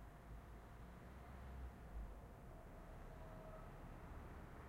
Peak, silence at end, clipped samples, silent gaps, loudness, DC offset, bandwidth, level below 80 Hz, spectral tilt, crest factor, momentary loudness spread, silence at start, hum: -42 dBFS; 0 s; under 0.1%; none; -58 LUFS; under 0.1%; 16 kHz; -58 dBFS; -7 dB/octave; 14 dB; 4 LU; 0 s; none